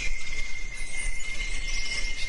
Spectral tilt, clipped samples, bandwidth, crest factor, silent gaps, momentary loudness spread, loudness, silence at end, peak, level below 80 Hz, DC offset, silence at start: -1 dB/octave; under 0.1%; 11 kHz; 10 dB; none; 5 LU; -33 LUFS; 0 s; -14 dBFS; -32 dBFS; under 0.1%; 0 s